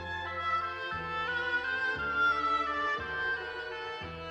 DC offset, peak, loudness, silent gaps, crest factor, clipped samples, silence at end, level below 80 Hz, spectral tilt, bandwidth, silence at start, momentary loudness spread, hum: under 0.1%; -20 dBFS; -32 LUFS; none; 14 dB; under 0.1%; 0 s; -56 dBFS; -4.5 dB/octave; 8.8 kHz; 0 s; 10 LU; none